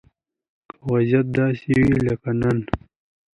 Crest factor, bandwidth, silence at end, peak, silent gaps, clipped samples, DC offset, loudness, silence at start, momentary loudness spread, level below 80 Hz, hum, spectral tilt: 20 dB; 10.5 kHz; 0.55 s; 0 dBFS; none; under 0.1%; under 0.1%; -21 LUFS; 0.85 s; 11 LU; -42 dBFS; none; -9 dB/octave